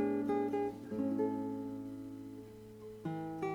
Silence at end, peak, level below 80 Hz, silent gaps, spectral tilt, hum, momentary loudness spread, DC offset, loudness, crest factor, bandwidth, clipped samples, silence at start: 0 s; -22 dBFS; -70 dBFS; none; -8 dB/octave; none; 16 LU; under 0.1%; -39 LUFS; 16 dB; 16.5 kHz; under 0.1%; 0 s